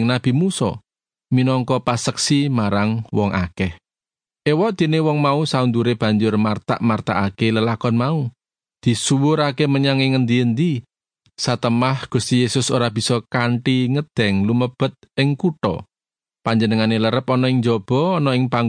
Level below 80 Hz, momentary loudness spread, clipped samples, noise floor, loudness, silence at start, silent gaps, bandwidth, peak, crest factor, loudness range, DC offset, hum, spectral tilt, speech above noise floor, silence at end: -54 dBFS; 6 LU; under 0.1%; under -90 dBFS; -19 LUFS; 0 s; none; 10 kHz; -2 dBFS; 16 dB; 2 LU; under 0.1%; none; -6 dB/octave; over 72 dB; 0 s